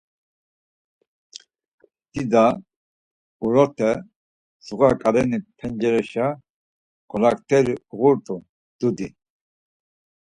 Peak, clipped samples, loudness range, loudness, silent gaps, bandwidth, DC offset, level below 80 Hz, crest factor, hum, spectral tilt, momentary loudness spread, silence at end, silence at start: -2 dBFS; under 0.1%; 2 LU; -21 LUFS; 2.76-3.40 s, 4.16-4.60 s, 6.50-7.08 s, 8.49-8.79 s; 11 kHz; under 0.1%; -56 dBFS; 22 dB; none; -7 dB/octave; 15 LU; 1.2 s; 2.15 s